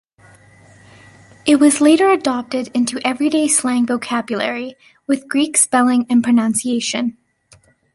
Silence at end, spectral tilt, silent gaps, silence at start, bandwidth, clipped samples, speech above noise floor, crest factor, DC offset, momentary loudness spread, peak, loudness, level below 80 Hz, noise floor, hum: 0.8 s; -2.5 dB/octave; none; 1.45 s; 12 kHz; under 0.1%; 36 dB; 18 dB; under 0.1%; 10 LU; 0 dBFS; -16 LUFS; -62 dBFS; -52 dBFS; none